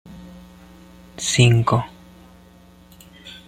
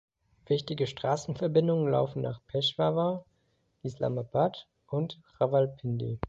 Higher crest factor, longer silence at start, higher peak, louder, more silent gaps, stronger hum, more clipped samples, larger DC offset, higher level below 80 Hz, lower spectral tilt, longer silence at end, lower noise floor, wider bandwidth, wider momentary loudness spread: about the same, 20 dB vs 18 dB; second, 0.1 s vs 0.5 s; first, -2 dBFS vs -12 dBFS; first, -18 LUFS vs -30 LUFS; neither; neither; neither; neither; first, -48 dBFS vs -58 dBFS; second, -4.5 dB/octave vs -7 dB/octave; first, 0.15 s vs 0 s; second, -48 dBFS vs -73 dBFS; first, 13.5 kHz vs 8 kHz; first, 27 LU vs 9 LU